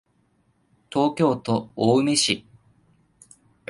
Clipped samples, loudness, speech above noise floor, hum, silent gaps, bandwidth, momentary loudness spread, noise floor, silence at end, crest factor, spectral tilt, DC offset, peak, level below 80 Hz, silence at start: under 0.1%; -22 LUFS; 44 dB; none; none; 11.5 kHz; 8 LU; -65 dBFS; 1.3 s; 20 dB; -4.5 dB/octave; under 0.1%; -6 dBFS; -62 dBFS; 0.9 s